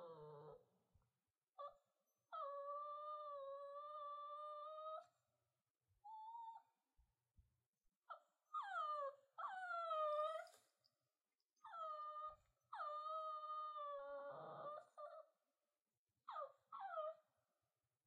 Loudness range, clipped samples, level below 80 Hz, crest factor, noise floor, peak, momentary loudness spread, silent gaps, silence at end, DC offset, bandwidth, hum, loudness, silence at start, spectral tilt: 9 LU; under 0.1%; under -90 dBFS; 18 dB; under -90 dBFS; -34 dBFS; 15 LU; 7.66-7.72 s, 15.97-16.06 s; 0.85 s; under 0.1%; 9.4 kHz; none; -51 LUFS; 0 s; -4 dB/octave